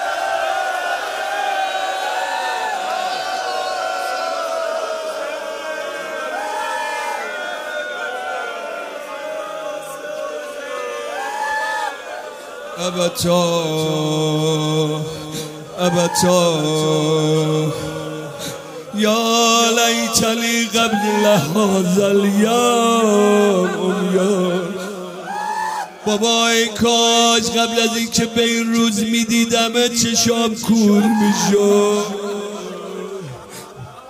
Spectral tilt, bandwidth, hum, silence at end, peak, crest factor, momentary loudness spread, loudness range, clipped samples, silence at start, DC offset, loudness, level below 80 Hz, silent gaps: -3.5 dB/octave; 16 kHz; none; 0 s; 0 dBFS; 18 dB; 14 LU; 10 LU; under 0.1%; 0 s; under 0.1%; -18 LUFS; -56 dBFS; none